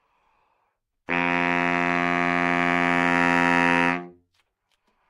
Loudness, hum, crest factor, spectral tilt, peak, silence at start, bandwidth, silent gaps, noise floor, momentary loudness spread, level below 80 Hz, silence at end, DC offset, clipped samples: -21 LUFS; none; 20 dB; -5.5 dB/octave; -4 dBFS; 1.1 s; 11.5 kHz; none; -74 dBFS; 5 LU; -64 dBFS; 1 s; under 0.1%; under 0.1%